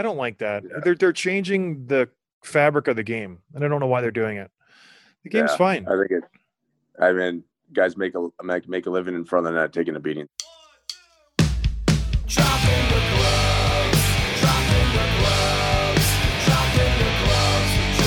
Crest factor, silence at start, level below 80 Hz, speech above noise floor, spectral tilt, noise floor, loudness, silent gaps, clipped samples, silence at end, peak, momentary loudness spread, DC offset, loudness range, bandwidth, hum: 18 dB; 0 s; -30 dBFS; 51 dB; -4.5 dB/octave; -73 dBFS; -21 LUFS; 2.33-2.41 s; under 0.1%; 0 s; -4 dBFS; 10 LU; under 0.1%; 6 LU; 18 kHz; none